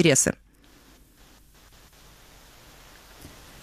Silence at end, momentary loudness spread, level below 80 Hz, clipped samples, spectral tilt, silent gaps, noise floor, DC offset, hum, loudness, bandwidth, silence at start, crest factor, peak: 0.35 s; 30 LU; -54 dBFS; under 0.1%; -3.5 dB/octave; none; -54 dBFS; under 0.1%; none; -23 LUFS; 15 kHz; 0 s; 22 dB; -8 dBFS